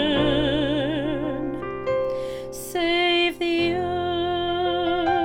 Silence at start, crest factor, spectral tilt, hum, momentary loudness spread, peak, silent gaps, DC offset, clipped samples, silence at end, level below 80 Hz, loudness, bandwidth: 0 s; 14 dB; -5 dB/octave; none; 9 LU; -8 dBFS; none; under 0.1%; under 0.1%; 0 s; -44 dBFS; -23 LUFS; 17 kHz